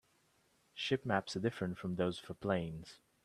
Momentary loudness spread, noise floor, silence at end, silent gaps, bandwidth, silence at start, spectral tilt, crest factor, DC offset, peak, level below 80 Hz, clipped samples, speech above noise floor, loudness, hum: 13 LU; -74 dBFS; 0.3 s; none; 13 kHz; 0.75 s; -6 dB/octave; 22 dB; under 0.1%; -16 dBFS; -68 dBFS; under 0.1%; 36 dB; -38 LUFS; none